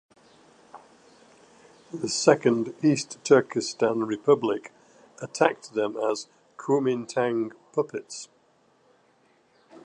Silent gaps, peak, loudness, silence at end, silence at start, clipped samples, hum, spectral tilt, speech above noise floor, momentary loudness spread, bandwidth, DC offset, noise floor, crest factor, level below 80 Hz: none; -4 dBFS; -25 LUFS; 1.6 s; 0.75 s; under 0.1%; none; -4.5 dB/octave; 39 dB; 17 LU; 11 kHz; under 0.1%; -63 dBFS; 24 dB; -76 dBFS